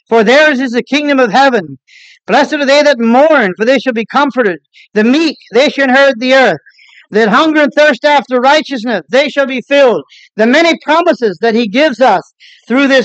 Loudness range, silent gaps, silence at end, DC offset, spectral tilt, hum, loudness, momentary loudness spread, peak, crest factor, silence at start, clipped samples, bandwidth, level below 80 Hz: 1 LU; none; 0 s; under 0.1%; -4.5 dB/octave; none; -9 LUFS; 8 LU; 0 dBFS; 10 dB; 0.1 s; under 0.1%; 8.6 kHz; -68 dBFS